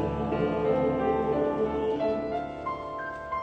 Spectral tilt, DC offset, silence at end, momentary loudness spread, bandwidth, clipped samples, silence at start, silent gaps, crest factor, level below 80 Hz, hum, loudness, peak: -8.5 dB/octave; under 0.1%; 0 s; 8 LU; 7.8 kHz; under 0.1%; 0 s; none; 14 dB; -48 dBFS; none; -28 LUFS; -14 dBFS